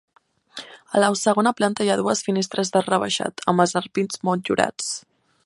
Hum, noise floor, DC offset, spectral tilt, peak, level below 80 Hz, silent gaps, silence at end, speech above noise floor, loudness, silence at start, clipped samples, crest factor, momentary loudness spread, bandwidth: none; -42 dBFS; under 0.1%; -4 dB/octave; -2 dBFS; -66 dBFS; none; 0.45 s; 21 dB; -22 LUFS; 0.55 s; under 0.1%; 20 dB; 11 LU; 11.5 kHz